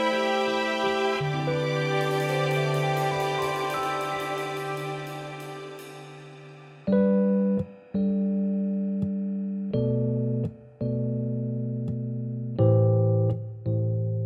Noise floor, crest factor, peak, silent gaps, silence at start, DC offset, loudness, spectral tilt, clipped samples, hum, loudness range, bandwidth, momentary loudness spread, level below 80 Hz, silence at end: -46 dBFS; 16 dB; -10 dBFS; none; 0 s; under 0.1%; -27 LUFS; -7 dB/octave; under 0.1%; none; 4 LU; 15 kHz; 14 LU; -58 dBFS; 0 s